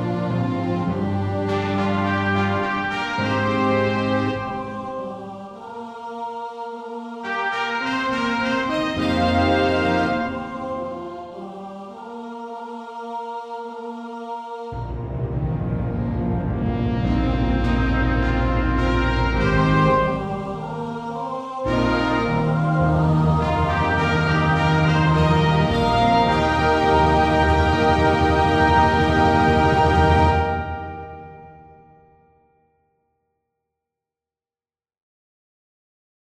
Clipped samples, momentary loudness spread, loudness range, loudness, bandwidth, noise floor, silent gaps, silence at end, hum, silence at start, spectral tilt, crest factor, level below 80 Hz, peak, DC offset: under 0.1%; 16 LU; 13 LU; -20 LUFS; 10 kHz; under -90 dBFS; none; 4.6 s; none; 0 s; -7 dB/octave; 16 dB; -32 dBFS; -4 dBFS; under 0.1%